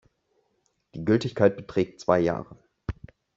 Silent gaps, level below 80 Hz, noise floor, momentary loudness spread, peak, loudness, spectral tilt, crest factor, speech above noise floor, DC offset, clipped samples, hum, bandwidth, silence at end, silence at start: none; -50 dBFS; -73 dBFS; 16 LU; -6 dBFS; -25 LUFS; -6.5 dB/octave; 22 dB; 48 dB; under 0.1%; under 0.1%; none; 7.8 kHz; 0.45 s; 0.95 s